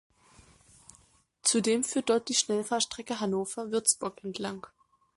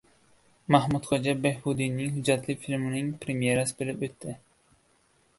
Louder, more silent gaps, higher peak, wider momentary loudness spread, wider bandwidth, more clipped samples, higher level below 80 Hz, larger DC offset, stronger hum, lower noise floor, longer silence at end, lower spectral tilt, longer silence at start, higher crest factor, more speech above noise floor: about the same, -29 LUFS vs -28 LUFS; neither; second, -10 dBFS vs -4 dBFS; about the same, 11 LU vs 11 LU; about the same, 12 kHz vs 11.5 kHz; neither; second, -70 dBFS vs -60 dBFS; neither; neither; about the same, -64 dBFS vs -66 dBFS; second, 0.5 s vs 1 s; second, -2.5 dB/octave vs -5.5 dB/octave; first, 1.45 s vs 0.7 s; about the same, 22 dB vs 24 dB; second, 34 dB vs 38 dB